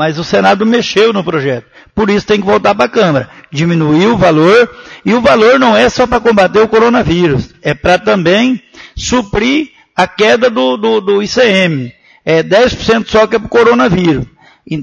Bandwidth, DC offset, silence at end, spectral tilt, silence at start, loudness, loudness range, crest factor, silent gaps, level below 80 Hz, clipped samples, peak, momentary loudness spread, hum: 9.6 kHz; under 0.1%; 0 s; -5.5 dB/octave; 0 s; -10 LUFS; 3 LU; 10 dB; none; -36 dBFS; 0.1%; 0 dBFS; 10 LU; none